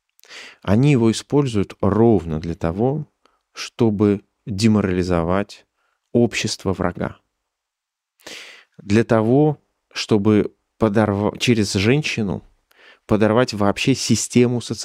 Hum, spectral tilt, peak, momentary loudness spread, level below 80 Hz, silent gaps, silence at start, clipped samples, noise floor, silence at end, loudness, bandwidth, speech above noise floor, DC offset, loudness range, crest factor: none; -6 dB/octave; -2 dBFS; 15 LU; -48 dBFS; none; 0.3 s; under 0.1%; -83 dBFS; 0 s; -19 LUFS; 14.5 kHz; 65 dB; under 0.1%; 5 LU; 18 dB